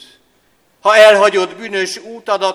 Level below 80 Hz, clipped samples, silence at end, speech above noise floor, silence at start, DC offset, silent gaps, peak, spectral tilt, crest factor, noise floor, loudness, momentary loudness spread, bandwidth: -60 dBFS; 0.4%; 0 s; 45 dB; 0.85 s; under 0.1%; none; 0 dBFS; -2.5 dB/octave; 14 dB; -57 dBFS; -12 LUFS; 14 LU; 14 kHz